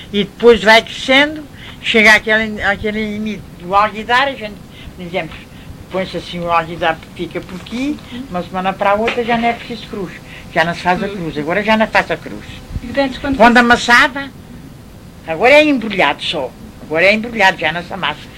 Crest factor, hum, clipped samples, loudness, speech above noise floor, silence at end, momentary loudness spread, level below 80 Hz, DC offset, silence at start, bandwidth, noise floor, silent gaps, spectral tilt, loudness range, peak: 16 dB; none; 0.2%; -14 LUFS; 21 dB; 0 s; 19 LU; -38 dBFS; under 0.1%; 0 s; 16.5 kHz; -36 dBFS; none; -4.5 dB/octave; 8 LU; 0 dBFS